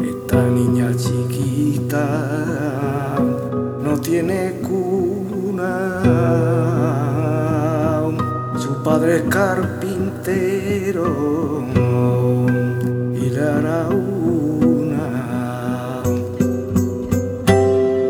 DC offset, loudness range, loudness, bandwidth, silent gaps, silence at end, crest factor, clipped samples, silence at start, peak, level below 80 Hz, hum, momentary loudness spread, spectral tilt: under 0.1%; 2 LU; -19 LUFS; 18 kHz; none; 0 s; 18 dB; under 0.1%; 0 s; 0 dBFS; -46 dBFS; none; 6 LU; -7.5 dB/octave